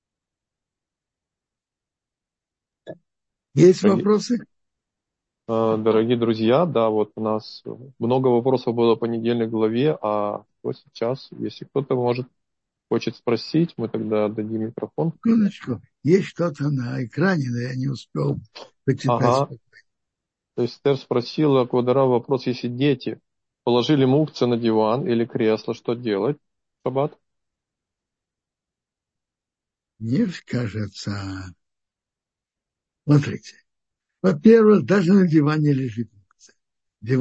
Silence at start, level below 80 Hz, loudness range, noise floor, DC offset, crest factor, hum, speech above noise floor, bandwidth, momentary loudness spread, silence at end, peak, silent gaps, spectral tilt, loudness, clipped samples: 2.85 s; -64 dBFS; 11 LU; -88 dBFS; under 0.1%; 20 dB; none; 68 dB; 8.2 kHz; 13 LU; 0 s; -2 dBFS; none; -7.5 dB/octave; -21 LUFS; under 0.1%